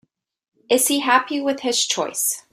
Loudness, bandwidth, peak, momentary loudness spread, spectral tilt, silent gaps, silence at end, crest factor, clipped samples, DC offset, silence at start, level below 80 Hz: -19 LUFS; 16 kHz; -2 dBFS; 5 LU; -0.5 dB/octave; none; 0.1 s; 20 dB; under 0.1%; under 0.1%; 0.7 s; -72 dBFS